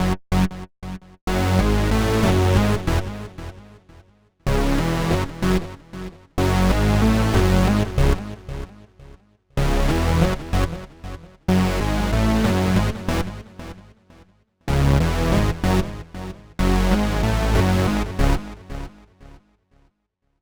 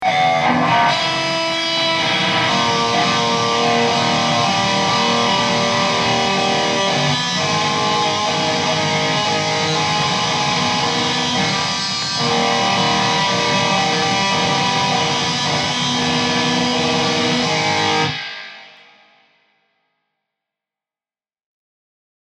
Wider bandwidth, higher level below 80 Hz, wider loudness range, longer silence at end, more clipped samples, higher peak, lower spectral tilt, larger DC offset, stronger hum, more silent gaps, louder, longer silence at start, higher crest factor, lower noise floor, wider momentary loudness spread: first, over 20 kHz vs 12 kHz; first, -26 dBFS vs -52 dBFS; about the same, 4 LU vs 3 LU; second, 1.1 s vs 3.6 s; neither; about the same, -4 dBFS vs -2 dBFS; first, -6.5 dB/octave vs -3 dB/octave; neither; neither; first, 1.21-1.27 s vs none; second, -21 LUFS vs -16 LUFS; about the same, 0 s vs 0 s; about the same, 16 dB vs 16 dB; second, -72 dBFS vs under -90 dBFS; first, 18 LU vs 2 LU